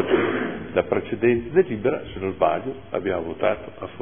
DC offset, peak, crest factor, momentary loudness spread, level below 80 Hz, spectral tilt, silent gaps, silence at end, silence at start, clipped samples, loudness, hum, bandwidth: 0.5%; -4 dBFS; 18 dB; 8 LU; -50 dBFS; -11 dB/octave; none; 0 s; 0 s; under 0.1%; -24 LUFS; none; 3.6 kHz